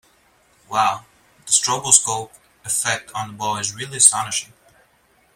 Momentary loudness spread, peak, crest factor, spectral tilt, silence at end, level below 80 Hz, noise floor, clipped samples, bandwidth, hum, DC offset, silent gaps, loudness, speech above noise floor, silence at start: 15 LU; 0 dBFS; 22 dB; -0.5 dB/octave; 0.9 s; -62 dBFS; -59 dBFS; under 0.1%; 16.5 kHz; none; under 0.1%; none; -18 LUFS; 39 dB; 0.7 s